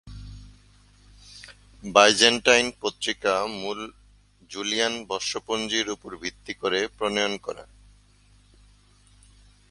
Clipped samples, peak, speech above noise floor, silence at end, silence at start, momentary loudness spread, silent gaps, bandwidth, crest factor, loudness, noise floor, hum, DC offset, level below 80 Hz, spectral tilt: under 0.1%; 0 dBFS; 33 dB; 2.05 s; 0.05 s; 25 LU; none; 11.5 kHz; 26 dB; -23 LUFS; -57 dBFS; 50 Hz at -55 dBFS; under 0.1%; -54 dBFS; -1.5 dB/octave